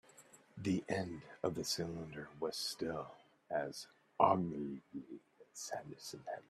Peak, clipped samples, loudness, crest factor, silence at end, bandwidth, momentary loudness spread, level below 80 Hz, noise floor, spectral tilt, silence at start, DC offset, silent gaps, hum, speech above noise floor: -14 dBFS; under 0.1%; -40 LUFS; 26 dB; 0.1 s; 14.5 kHz; 20 LU; -74 dBFS; -64 dBFS; -4.5 dB/octave; 0.15 s; under 0.1%; none; none; 23 dB